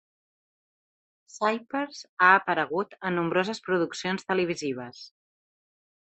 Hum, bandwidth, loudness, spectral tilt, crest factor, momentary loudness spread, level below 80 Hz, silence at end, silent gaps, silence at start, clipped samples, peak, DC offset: none; 8.4 kHz; -26 LUFS; -4.5 dB/octave; 24 dB; 14 LU; -72 dBFS; 1.05 s; 2.09-2.17 s; 1.35 s; under 0.1%; -4 dBFS; under 0.1%